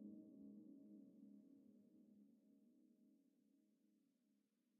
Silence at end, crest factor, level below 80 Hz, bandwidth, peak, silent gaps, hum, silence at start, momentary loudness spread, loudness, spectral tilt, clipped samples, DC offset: 0 s; 18 dB; under -90 dBFS; 1.1 kHz; -50 dBFS; none; none; 0 s; 6 LU; -64 LUFS; -11 dB/octave; under 0.1%; under 0.1%